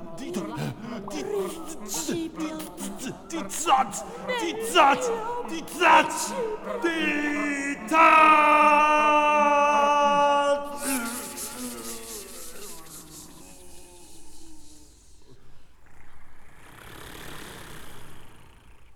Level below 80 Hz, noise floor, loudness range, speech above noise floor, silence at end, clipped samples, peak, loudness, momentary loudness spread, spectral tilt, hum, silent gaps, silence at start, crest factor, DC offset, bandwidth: -54 dBFS; -48 dBFS; 18 LU; 25 dB; 0 s; under 0.1%; -4 dBFS; -23 LUFS; 23 LU; -3 dB/octave; none; none; 0 s; 20 dB; under 0.1%; over 20 kHz